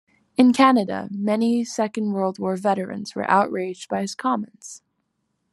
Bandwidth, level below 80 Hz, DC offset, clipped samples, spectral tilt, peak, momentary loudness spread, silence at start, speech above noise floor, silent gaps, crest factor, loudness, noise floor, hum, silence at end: 12 kHz; -72 dBFS; under 0.1%; under 0.1%; -5.5 dB/octave; -2 dBFS; 12 LU; 0.4 s; 53 dB; none; 20 dB; -22 LUFS; -74 dBFS; none; 0.75 s